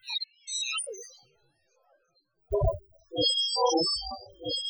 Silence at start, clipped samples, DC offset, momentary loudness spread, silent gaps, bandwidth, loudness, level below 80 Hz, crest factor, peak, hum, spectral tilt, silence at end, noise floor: 0.05 s; under 0.1%; under 0.1%; 15 LU; none; over 20 kHz; -28 LUFS; -44 dBFS; 18 dB; -14 dBFS; none; -3 dB/octave; 0 s; -72 dBFS